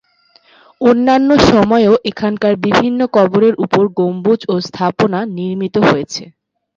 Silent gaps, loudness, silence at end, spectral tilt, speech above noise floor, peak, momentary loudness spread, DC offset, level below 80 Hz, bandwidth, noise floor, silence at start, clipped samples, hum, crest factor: none; -13 LUFS; 0.5 s; -6 dB/octave; 39 dB; 0 dBFS; 9 LU; under 0.1%; -42 dBFS; 7.6 kHz; -51 dBFS; 0.8 s; under 0.1%; none; 14 dB